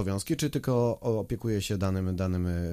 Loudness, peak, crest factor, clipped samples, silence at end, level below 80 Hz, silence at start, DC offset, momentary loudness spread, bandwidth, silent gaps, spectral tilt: -29 LUFS; -14 dBFS; 14 dB; under 0.1%; 0 s; -48 dBFS; 0 s; under 0.1%; 3 LU; 15.5 kHz; none; -6.5 dB/octave